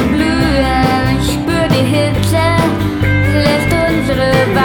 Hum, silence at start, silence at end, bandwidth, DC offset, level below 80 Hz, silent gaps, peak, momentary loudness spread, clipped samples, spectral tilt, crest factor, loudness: none; 0 s; 0 s; 18.5 kHz; under 0.1%; -24 dBFS; none; 0 dBFS; 3 LU; under 0.1%; -6 dB/octave; 12 dB; -13 LUFS